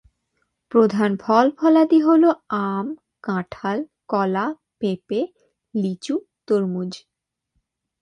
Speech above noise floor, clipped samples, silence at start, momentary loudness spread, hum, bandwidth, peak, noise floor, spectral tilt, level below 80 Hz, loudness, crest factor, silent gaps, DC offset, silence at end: 54 dB; under 0.1%; 0.7 s; 13 LU; none; 10.5 kHz; -2 dBFS; -73 dBFS; -7.5 dB/octave; -66 dBFS; -21 LUFS; 20 dB; none; under 0.1%; 1.05 s